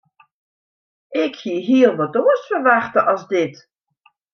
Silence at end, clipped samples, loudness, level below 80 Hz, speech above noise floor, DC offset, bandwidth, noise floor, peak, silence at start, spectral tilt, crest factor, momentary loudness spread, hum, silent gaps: 0.8 s; under 0.1%; -18 LUFS; -70 dBFS; 43 dB; under 0.1%; 6.6 kHz; -60 dBFS; -2 dBFS; 1.1 s; -6 dB/octave; 18 dB; 9 LU; none; none